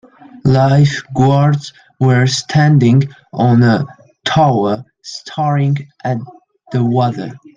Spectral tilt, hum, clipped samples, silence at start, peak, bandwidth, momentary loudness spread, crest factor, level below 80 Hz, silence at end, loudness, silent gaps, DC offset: -6.5 dB/octave; none; under 0.1%; 0.45 s; -2 dBFS; 7.6 kHz; 13 LU; 12 dB; -48 dBFS; 0.2 s; -14 LUFS; none; under 0.1%